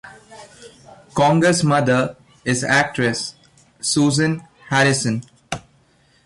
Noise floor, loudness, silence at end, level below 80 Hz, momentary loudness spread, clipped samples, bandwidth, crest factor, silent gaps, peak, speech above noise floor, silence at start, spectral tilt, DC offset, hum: -57 dBFS; -18 LUFS; 0.65 s; -54 dBFS; 14 LU; under 0.1%; 11.5 kHz; 14 dB; none; -6 dBFS; 39 dB; 0.05 s; -4.5 dB/octave; under 0.1%; none